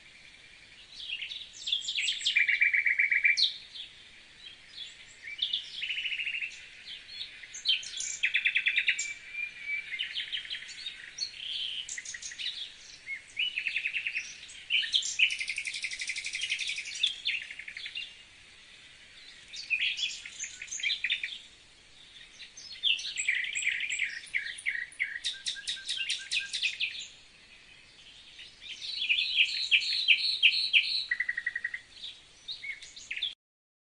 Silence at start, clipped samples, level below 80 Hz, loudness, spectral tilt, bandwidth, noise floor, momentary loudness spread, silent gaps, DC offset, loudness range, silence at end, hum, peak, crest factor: 0 s; under 0.1%; -70 dBFS; -29 LUFS; 3.5 dB/octave; 10 kHz; -56 dBFS; 20 LU; none; under 0.1%; 9 LU; 0.55 s; none; -8 dBFS; 24 dB